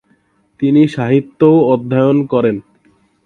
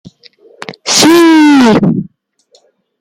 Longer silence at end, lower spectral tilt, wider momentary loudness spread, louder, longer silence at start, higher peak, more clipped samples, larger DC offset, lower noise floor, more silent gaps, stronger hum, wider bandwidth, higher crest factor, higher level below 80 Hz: second, 0.65 s vs 1 s; first, -9.5 dB/octave vs -4 dB/octave; second, 7 LU vs 19 LU; second, -13 LUFS vs -7 LUFS; about the same, 0.6 s vs 0.7 s; about the same, 0 dBFS vs 0 dBFS; neither; neither; first, -57 dBFS vs -51 dBFS; neither; neither; second, 6.8 kHz vs 16.5 kHz; about the same, 14 dB vs 10 dB; second, -56 dBFS vs -50 dBFS